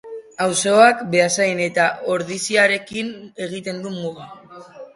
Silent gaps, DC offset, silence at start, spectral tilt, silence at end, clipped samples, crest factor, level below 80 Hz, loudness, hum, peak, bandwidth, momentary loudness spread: none; under 0.1%; 0.05 s; -3 dB/octave; 0.1 s; under 0.1%; 20 dB; -64 dBFS; -18 LUFS; none; 0 dBFS; 11.5 kHz; 17 LU